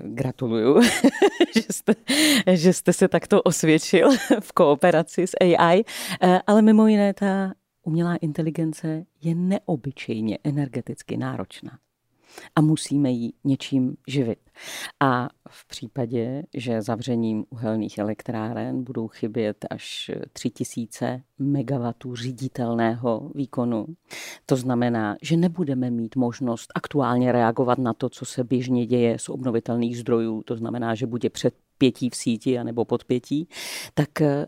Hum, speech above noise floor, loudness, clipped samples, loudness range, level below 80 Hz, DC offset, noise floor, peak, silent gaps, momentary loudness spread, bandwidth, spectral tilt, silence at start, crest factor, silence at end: none; 37 dB; -23 LUFS; under 0.1%; 9 LU; -64 dBFS; under 0.1%; -59 dBFS; -4 dBFS; none; 13 LU; 16 kHz; -5.5 dB/octave; 0 s; 18 dB; 0 s